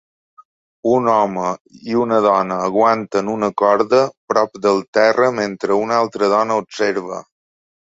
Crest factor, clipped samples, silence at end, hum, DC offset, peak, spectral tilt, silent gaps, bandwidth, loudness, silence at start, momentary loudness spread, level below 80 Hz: 16 dB; under 0.1%; 0.75 s; none; under 0.1%; -2 dBFS; -5.5 dB/octave; 1.61-1.65 s, 4.17-4.28 s, 4.88-4.93 s; 7.8 kHz; -17 LUFS; 0.85 s; 8 LU; -60 dBFS